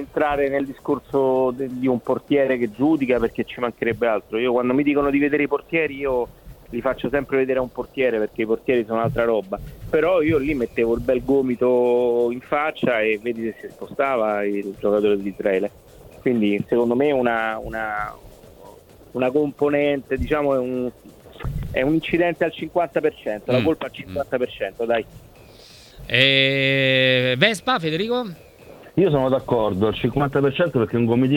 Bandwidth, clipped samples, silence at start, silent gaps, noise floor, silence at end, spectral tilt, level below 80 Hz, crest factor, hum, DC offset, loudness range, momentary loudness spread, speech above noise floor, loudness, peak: 18.5 kHz; under 0.1%; 0 s; none; -46 dBFS; 0 s; -6.5 dB/octave; -44 dBFS; 22 dB; none; under 0.1%; 5 LU; 9 LU; 25 dB; -21 LUFS; 0 dBFS